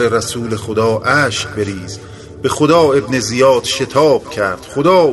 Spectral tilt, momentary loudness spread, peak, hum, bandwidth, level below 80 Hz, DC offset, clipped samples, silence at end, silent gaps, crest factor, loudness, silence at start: -4.5 dB/octave; 11 LU; 0 dBFS; none; 12 kHz; -44 dBFS; under 0.1%; under 0.1%; 0 s; none; 14 dB; -14 LUFS; 0 s